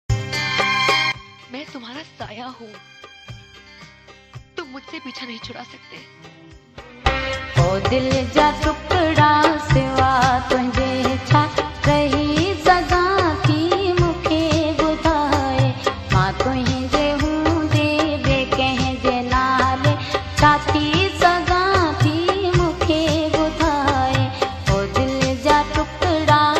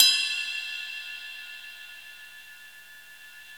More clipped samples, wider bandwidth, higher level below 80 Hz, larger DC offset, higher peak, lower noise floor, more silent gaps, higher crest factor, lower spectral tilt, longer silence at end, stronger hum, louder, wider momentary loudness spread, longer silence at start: neither; second, 13.5 kHz vs over 20 kHz; first, -34 dBFS vs -76 dBFS; second, under 0.1% vs 0.1%; about the same, 0 dBFS vs -2 dBFS; second, -45 dBFS vs -49 dBFS; neither; second, 18 dB vs 30 dB; first, -5.5 dB/octave vs 4 dB/octave; about the same, 0 s vs 0 s; second, none vs 60 Hz at -75 dBFS; first, -18 LUFS vs -28 LUFS; second, 17 LU vs 20 LU; about the same, 0.1 s vs 0 s